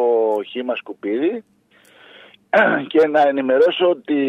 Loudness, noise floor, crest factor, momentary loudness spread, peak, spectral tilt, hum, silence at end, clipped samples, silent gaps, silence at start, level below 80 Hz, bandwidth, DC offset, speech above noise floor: -18 LUFS; -50 dBFS; 16 dB; 10 LU; -4 dBFS; -6 dB/octave; none; 0 s; under 0.1%; none; 0 s; -72 dBFS; 6.4 kHz; under 0.1%; 33 dB